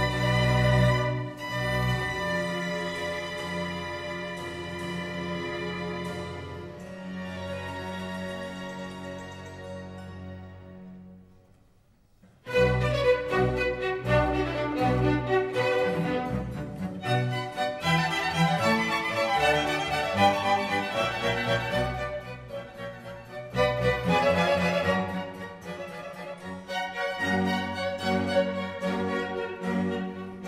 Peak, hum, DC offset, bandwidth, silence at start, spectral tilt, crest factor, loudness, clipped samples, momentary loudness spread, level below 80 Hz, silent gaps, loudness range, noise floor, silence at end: -10 dBFS; none; under 0.1%; 15.5 kHz; 0 s; -5.5 dB/octave; 18 dB; -28 LUFS; under 0.1%; 16 LU; -46 dBFS; none; 11 LU; -61 dBFS; 0 s